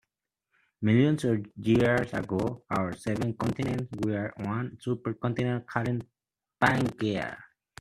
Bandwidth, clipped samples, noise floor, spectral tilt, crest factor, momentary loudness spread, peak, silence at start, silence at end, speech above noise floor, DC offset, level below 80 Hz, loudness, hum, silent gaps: 13 kHz; under 0.1%; -84 dBFS; -7 dB/octave; 22 dB; 9 LU; -6 dBFS; 0.8 s; 0.35 s; 56 dB; under 0.1%; -58 dBFS; -29 LUFS; none; none